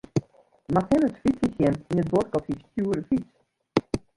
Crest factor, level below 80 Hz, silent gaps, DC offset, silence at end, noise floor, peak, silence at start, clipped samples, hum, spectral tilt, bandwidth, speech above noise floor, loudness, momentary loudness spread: 20 dB; -50 dBFS; none; under 0.1%; 0.2 s; -49 dBFS; -6 dBFS; 0.15 s; under 0.1%; none; -7.5 dB/octave; 11.5 kHz; 25 dB; -26 LUFS; 7 LU